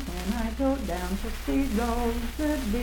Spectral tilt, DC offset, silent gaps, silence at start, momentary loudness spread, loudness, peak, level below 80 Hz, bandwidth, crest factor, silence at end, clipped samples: -5.5 dB/octave; under 0.1%; none; 0 s; 4 LU; -29 LUFS; -14 dBFS; -34 dBFS; 19 kHz; 14 dB; 0 s; under 0.1%